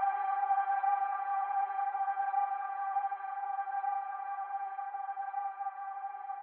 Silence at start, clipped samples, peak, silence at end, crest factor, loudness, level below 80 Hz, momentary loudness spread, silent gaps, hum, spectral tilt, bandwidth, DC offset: 0 s; under 0.1%; -20 dBFS; 0 s; 14 dB; -35 LUFS; under -90 dBFS; 8 LU; none; none; 5.5 dB/octave; 3.3 kHz; under 0.1%